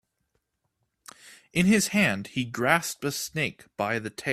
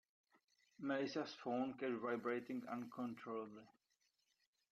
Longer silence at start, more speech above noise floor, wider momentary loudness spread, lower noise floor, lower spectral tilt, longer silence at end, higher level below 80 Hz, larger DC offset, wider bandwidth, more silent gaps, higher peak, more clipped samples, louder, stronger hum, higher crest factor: first, 1.25 s vs 0.8 s; first, 51 dB vs 40 dB; first, 10 LU vs 7 LU; second, -77 dBFS vs -85 dBFS; second, -4 dB/octave vs -6 dB/octave; second, 0 s vs 1 s; first, -60 dBFS vs -90 dBFS; neither; first, 15.5 kHz vs 13 kHz; neither; first, -4 dBFS vs -30 dBFS; neither; first, -26 LUFS vs -45 LUFS; neither; first, 24 dB vs 18 dB